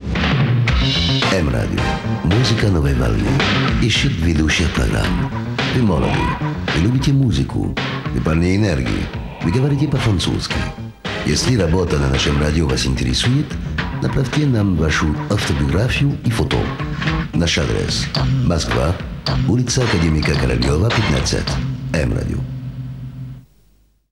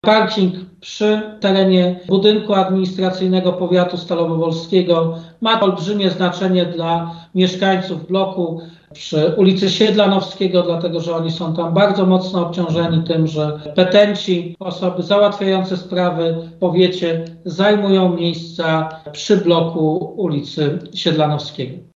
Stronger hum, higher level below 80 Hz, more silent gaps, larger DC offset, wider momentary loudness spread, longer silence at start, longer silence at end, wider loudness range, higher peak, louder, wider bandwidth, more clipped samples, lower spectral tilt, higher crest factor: neither; first, -26 dBFS vs -58 dBFS; neither; first, 0.1% vs under 0.1%; about the same, 7 LU vs 8 LU; about the same, 0 s vs 0.05 s; first, 0.7 s vs 0.15 s; about the same, 2 LU vs 2 LU; about the same, -2 dBFS vs 0 dBFS; about the same, -18 LUFS vs -17 LUFS; first, 12.5 kHz vs 7.4 kHz; neither; about the same, -5.5 dB/octave vs -6.5 dB/octave; about the same, 14 dB vs 16 dB